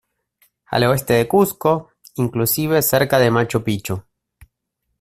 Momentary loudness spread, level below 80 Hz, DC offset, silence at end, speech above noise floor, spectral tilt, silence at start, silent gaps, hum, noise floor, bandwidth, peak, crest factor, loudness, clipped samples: 9 LU; -50 dBFS; under 0.1%; 1 s; 58 dB; -5 dB/octave; 0.7 s; none; none; -75 dBFS; 16 kHz; -2 dBFS; 18 dB; -18 LUFS; under 0.1%